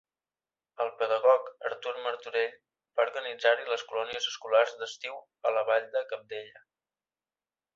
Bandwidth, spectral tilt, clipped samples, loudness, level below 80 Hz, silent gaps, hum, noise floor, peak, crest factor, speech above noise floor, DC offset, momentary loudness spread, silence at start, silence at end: 7.6 kHz; -0.5 dB/octave; under 0.1%; -30 LUFS; -82 dBFS; none; none; under -90 dBFS; -10 dBFS; 22 dB; over 60 dB; under 0.1%; 12 LU; 0.8 s; 1.15 s